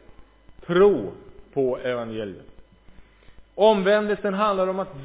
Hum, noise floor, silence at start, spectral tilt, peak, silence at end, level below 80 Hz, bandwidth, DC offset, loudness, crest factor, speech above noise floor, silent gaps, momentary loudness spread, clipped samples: none; -49 dBFS; 0.2 s; -10 dB/octave; -4 dBFS; 0 s; -54 dBFS; 4 kHz; under 0.1%; -22 LUFS; 20 dB; 28 dB; none; 15 LU; under 0.1%